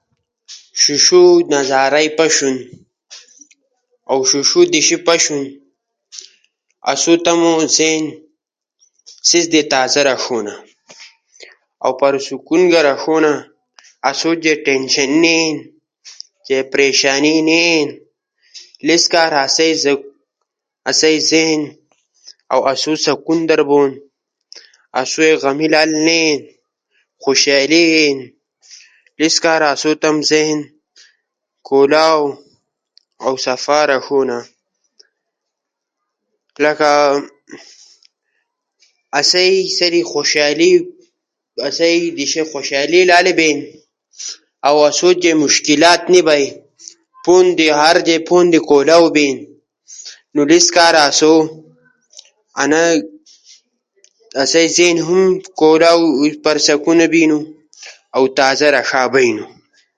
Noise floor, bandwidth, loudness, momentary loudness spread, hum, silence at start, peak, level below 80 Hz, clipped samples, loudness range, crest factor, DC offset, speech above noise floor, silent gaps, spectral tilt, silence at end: -79 dBFS; 11.5 kHz; -13 LUFS; 12 LU; none; 0.5 s; 0 dBFS; -64 dBFS; under 0.1%; 5 LU; 14 dB; under 0.1%; 66 dB; none; -2.5 dB/octave; 0.5 s